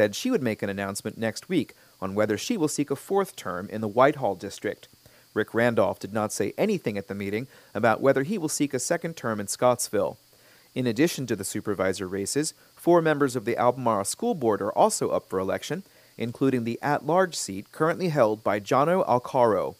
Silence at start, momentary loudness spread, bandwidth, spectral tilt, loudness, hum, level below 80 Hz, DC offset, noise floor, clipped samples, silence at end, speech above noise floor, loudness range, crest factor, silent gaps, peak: 0 s; 10 LU; 15.5 kHz; -5 dB/octave; -26 LUFS; none; -68 dBFS; under 0.1%; -56 dBFS; under 0.1%; 0.05 s; 31 dB; 3 LU; 20 dB; none; -4 dBFS